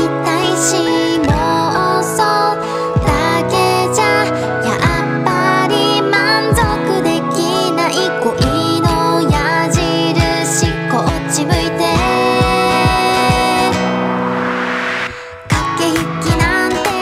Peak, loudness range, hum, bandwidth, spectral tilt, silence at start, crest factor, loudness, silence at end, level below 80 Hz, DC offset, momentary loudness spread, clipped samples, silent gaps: -2 dBFS; 1 LU; none; 16 kHz; -4.5 dB/octave; 0 s; 12 dB; -14 LUFS; 0 s; -30 dBFS; under 0.1%; 4 LU; under 0.1%; none